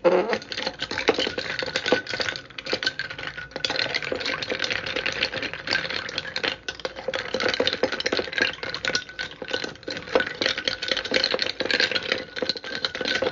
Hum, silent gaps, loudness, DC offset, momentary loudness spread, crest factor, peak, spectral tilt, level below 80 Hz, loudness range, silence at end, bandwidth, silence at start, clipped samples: none; none; -25 LUFS; under 0.1%; 7 LU; 22 dB; -6 dBFS; -2.5 dB/octave; -56 dBFS; 2 LU; 0 s; 7.6 kHz; 0 s; under 0.1%